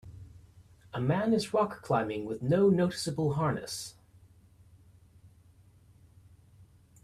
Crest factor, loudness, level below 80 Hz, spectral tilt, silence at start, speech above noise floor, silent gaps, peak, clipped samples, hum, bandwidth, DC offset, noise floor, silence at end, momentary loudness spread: 18 dB; -30 LUFS; -62 dBFS; -6.5 dB/octave; 0.05 s; 31 dB; none; -16 dBFS; under 0.1%; none; 14.5 kHz; under 0.1%; -60 dBFS; 0.4 s; 15 LU